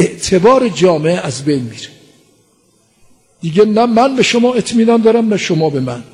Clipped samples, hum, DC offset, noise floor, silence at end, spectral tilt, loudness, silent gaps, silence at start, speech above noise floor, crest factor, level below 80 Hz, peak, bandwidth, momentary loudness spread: under 0.1%; none; under 0.1%; -54 dBFS; 0.1 s; -5.5 dB/octave; -12 LUFS; none; 0 s; 43 dB; 12 dB; -48 dBFS; 0 dBFS; 10.5 kHz; 9 LU